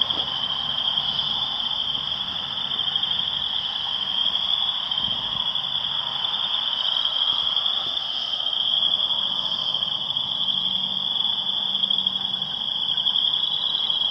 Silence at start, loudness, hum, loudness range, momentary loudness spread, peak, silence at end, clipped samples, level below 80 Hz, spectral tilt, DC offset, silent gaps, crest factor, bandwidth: 0 s; -21 LUFS; none; 2 LU; 4 LU; -6 dBFS; 0 s; under 0.1%; -58 dBFS; -2.5 dB/octave; under 0.1%; none; 20 dB; 11 kHz